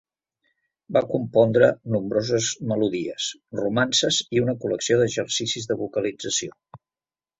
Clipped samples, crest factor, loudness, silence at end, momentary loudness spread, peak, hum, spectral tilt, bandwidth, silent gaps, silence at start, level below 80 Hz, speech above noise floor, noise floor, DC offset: under 0.1%; 20 dB; -23 LUFS; 0.65 s; 8 LU; -4 dBFS; none; -4 dB/octave; 8.2 kHz; none; 0.9 s; -60 dBFS; over 67 dB; under -90 dBFS; under 0.1%